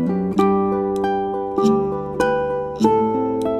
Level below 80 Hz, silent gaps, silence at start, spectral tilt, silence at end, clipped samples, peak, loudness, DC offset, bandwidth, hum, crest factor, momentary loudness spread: -48 dBFS; none; 0 s; -7.5 dB/octave; 0 s; under 0.1%; -2 dBFS; -19 LUFS; under 0.1%; 14 kHz; none; 16 dB; 5 LU